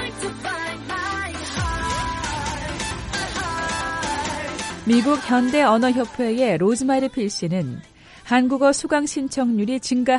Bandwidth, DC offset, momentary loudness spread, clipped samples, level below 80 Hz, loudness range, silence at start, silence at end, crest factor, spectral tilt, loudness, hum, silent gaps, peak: 11.5 kHz; under 0.1%; 9 LU; under 0.1%; -40 dBFS; 6 LU; 0 s; 0 s; 18 dB; -4.5 dB/octave; -22 LUFS; none; none; -4 dBFS